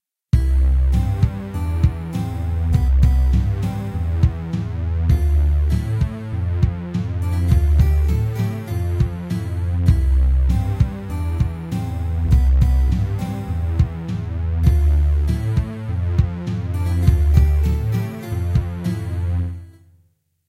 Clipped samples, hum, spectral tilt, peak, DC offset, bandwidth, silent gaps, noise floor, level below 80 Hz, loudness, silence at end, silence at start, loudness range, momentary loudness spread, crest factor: under 0.1%; none; -8.5 dB/octave; 0 dBFS; under 0.1%; 12.5 kHz; none; -61 dBFS; -20 dBFS; -20 LUFS; 0.8 s; 0.35 s; 1 LU; 9 LU; 18 dB